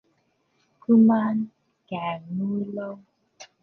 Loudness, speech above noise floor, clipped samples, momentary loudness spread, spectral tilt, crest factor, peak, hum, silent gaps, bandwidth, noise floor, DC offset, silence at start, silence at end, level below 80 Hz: -23 LUFS; 47 dB; under 0.1%; 19 LU; -8.5 dB/octave; 16 dB; -8 dBFS; none; none; 6.4 kHz; -69 dBFS; under 0.1%; 0.9 s; 0.15 s; -72 dBFS